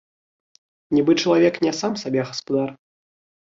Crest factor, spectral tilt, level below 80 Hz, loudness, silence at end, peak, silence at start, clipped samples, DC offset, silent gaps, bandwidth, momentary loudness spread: 18 dB; -5 dB/octave; -62 dBFS; -21 LUFS; 0.65 s; -6 dBFS; 0.9 s; under 0.1%; under 0.1%; none; 7.6 kHz; 7 LU